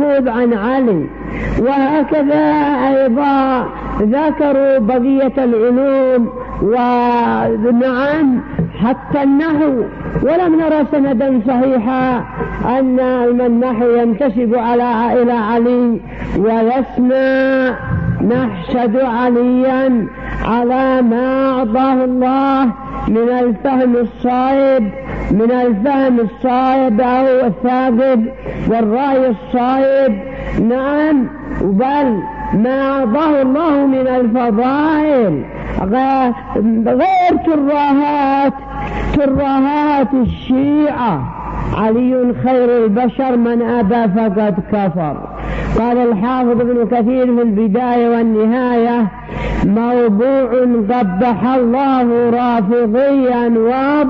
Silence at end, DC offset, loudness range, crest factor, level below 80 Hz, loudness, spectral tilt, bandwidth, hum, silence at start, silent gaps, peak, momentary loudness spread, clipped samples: 0 s; under 0.1%; 1 LU; 8 dB; -34 dBFS; -14 LUFS; -9.5 dB/octave; 5.6 kHz; none; 0 s; none; -6 dBFS; 5 LU; under 0.1%